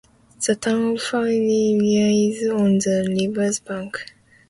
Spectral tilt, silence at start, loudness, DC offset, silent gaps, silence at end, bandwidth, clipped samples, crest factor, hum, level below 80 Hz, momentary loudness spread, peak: -5 dB/octave; 0.4 s; -20 LUFS; under 0.1%; none; 0.45 s; 11.5 kHz; under 0.1%; 14 dB; none; -60 dBFS; 11 LU; -6 dBFS